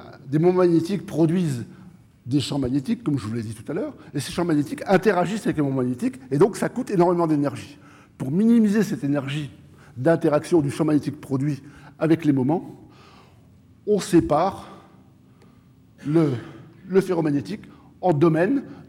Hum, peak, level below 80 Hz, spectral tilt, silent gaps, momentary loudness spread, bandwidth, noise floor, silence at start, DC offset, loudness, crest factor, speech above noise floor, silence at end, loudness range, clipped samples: none; -8 dBFS; -56 dBFS; -7 dB/octave; none; 14 LU; 15.5 kHz; -53 dBFS; 0 s; under 0.1%; -22 LUFS; 16 dB; 31 dB; 0.05 s; 4 LU; under 0.1%